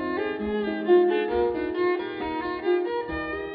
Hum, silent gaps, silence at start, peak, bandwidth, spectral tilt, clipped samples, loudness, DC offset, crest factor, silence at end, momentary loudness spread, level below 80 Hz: none; none; 0 s; -10 dBFS; 4.9 kHz; -10 dB/octave; under 0.1%; -25 LUFS; under 0.1%; 16 dB; 0 s; 9 LU; -50 dBFS